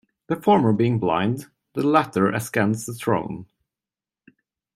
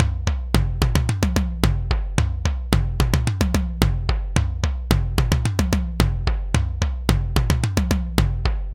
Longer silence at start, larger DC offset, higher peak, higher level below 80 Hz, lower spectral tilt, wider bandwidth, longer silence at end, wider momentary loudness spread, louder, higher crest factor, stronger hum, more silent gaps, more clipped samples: first, 0.3 s vs 0 s; neither; second, -4 dBFS vs 0 dBFS; second, -62 dBFS vs -24 dBFS; about the same, -6.5 dB/octave vs -5.5 dB/octave; about the same, 15.5 kHz vs 17 kHz; first, 1.3 s vs 0 s; first, 13 LU vs 3 LU; about the same, -22 LUFS vs -22 LUFS; about the same, 20 dB vs 20 dB; neither; neither; neither